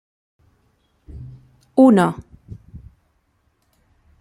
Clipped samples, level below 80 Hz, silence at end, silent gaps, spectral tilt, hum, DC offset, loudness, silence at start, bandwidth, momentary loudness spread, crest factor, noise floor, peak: under 0.1%; -50 dBFS; 1.45 s; none; -7.5 dB/octave; none; under 0.1%; -15 LUFS; 1.15 s; 11.5 kHz; 29 LU; 20 dB; -65 dBFS; -2 dBFS